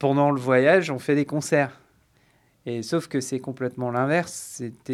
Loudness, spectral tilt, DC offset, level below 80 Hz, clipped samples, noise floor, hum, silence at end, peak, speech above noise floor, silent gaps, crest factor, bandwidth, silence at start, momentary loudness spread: -24 LUFS; -5.5 dB/octave; under 0.1%; -70 dBFS; under 0.1%; -62 dBFS; none; 0 s; -6 dBFS; 39 dB; none; 18 dB; 14 kHz; 0 s; 14 LU